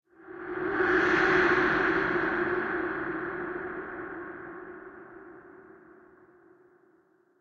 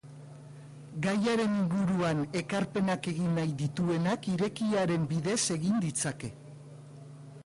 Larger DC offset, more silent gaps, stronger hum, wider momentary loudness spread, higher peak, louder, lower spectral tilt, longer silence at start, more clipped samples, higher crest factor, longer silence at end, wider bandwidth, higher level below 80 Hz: neither; neither; neither; first, 24 LU vs 20 LU; first, -12 dBFS vs -18 dBFS; first, -27 LUFS vs -30 LUFS; about the same, -6 dB/octave vs -5.5 dB/octave; first, 0.2 s vs 0.05 s; neither; first, 20 dB vs 12 dB; first, 1.65 s vs 0.05 s; second, 7.2 kHz vs 11.5 kHz; first, -58 dBFS vs -64 dBFS